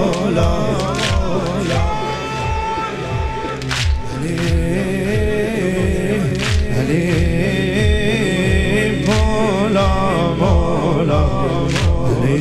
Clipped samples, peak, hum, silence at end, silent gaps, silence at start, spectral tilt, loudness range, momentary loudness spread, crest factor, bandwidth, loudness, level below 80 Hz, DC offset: under 0.1%; -2 dBFS; none; 0 s; none; 0 s; -6 dB/octave; 4 LU; 6 LU; 14 dB; 14.5 kHz; -17 LUFS; -24 dBFS; under 0.1%